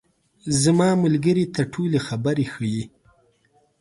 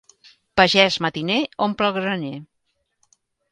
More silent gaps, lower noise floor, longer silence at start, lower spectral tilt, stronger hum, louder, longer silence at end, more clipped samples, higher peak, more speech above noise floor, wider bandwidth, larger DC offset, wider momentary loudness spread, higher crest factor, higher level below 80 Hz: neither; second, -63 dBFS vs -72 dBFS; about the same, 0.45 s vs 0.55 s; first, -6 dB/octave vs -4.5 dB/octave; neither; about the same, -21 LUFS vs -19 LUFS; about the same, 0.95 s vs 1.05 s; neither; second, -6 dBFS vs 0 dBFS; second, 42 dB vs 52 dB; about the same, 11.5 kHz vs 11 kHz; neither; about the same, 11 LU vs 13 LU; second, 16 dB vs 22 dB; about the same, -56 dBFS vs -54 dBFS